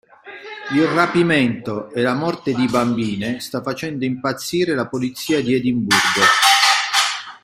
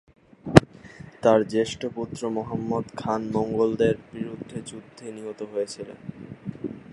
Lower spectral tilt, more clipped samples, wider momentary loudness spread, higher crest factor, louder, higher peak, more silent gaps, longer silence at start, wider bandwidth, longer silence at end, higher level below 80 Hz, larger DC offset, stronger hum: second, -3.5 dB/octave vs -6.5 dB/octave; neither; second, 12 LU vs 22 LU; second, 18 dB vs 26 dB; first, -17 LUFS vs -25 LUFS; about the same, 0 dBFS vs 0 dBFS; neither; second, 0.25 s vs 0.45 s; first, 16.5 kHz vs 11.5 kHz; about the same, 0.05 s vs 0 s; second, -56 dBFS vs -48 dBFS; neither; neither